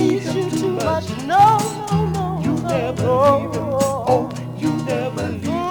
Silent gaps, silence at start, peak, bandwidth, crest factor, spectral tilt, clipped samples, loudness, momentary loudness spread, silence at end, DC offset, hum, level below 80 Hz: none; 0 s; -2 dBFS; over 20 kHz; 16 dB; -6 dB/octave; under 0.1%; -19 LUFS; 9 LU; 0 s; under 0.1%; none; -48 dBFS